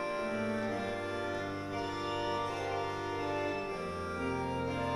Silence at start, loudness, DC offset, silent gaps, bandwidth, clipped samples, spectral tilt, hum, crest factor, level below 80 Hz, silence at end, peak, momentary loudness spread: 0 s; -36 LUFS; under 0.1%; none; 15.5 kHz; under 0.1%; -5.5 dB/octave; none; 14 dB; -58 dBFS; 0 s; -22 dBFS; 3 LU